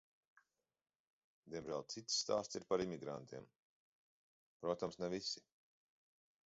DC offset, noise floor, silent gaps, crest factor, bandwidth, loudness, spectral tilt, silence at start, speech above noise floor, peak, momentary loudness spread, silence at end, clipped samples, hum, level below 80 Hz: under 0.1%; -77 dBFS; 3.59-4.60 s; 22 dB; 7.6 kHz; -43 LUFS; -3.5 dB/octave; 1.45 s; 34 dB; -24 dBFS; 12 LU; 1.1 s; under 0.1%; none; -78 dBFS